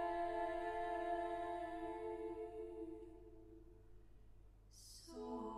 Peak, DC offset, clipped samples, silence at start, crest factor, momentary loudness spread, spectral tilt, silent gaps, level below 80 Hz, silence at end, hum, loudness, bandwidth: -32 dBFS; under 0.1%; under 0.1%; 0 s; 14 dB; 20 LU; -5 dB/octave; none; -64 dBFS; 0 s; none; -46 LUFS; 14.5 kHz